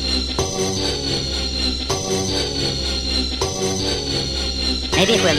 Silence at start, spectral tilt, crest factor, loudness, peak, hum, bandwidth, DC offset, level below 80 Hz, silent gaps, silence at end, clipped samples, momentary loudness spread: 0 s; -3 dB/octave; 18 dB; -20 LUFS; -2 dBFS; none; 15.5 kHz; under 0.1%; -30 dBFS; none; 0 s; under 0.1%; 3 LU